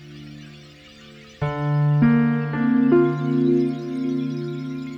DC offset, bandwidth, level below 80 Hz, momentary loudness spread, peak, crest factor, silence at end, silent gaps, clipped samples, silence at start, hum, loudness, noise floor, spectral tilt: under 0.1%; 6.2 kHz; -54 dBFS; 15 LU; -6 dBFS; 16 dB; 0 s; none; under 0.1%; 0 s; none; -21 LUFS; -45 dBFS; -9.5 dB/octave